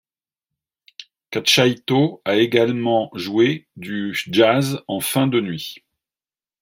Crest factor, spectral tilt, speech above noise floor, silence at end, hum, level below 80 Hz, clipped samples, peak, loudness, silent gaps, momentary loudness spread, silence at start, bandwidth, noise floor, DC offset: 18 dB; -4.5 dB/octave; over 71 dB; 0.85 s; none; -64 dBFS; under 0.1%; -2 dBFS; -19 LUFS; none; 12 LU; 1 s; 16.5 kHz; under -90 dBFS; under 0.1%